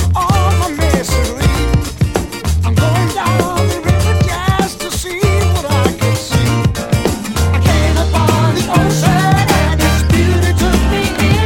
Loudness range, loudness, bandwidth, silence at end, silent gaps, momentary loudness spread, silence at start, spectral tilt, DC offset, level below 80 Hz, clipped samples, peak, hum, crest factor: 2 LU; -13 LUFS; 17 kHz; 0 s; none; 5 LU; 0 s; -5.5 dB/octave; under 0.1%; -20 dBFS; under 0.1%; 0 dBFS; none; 12 dB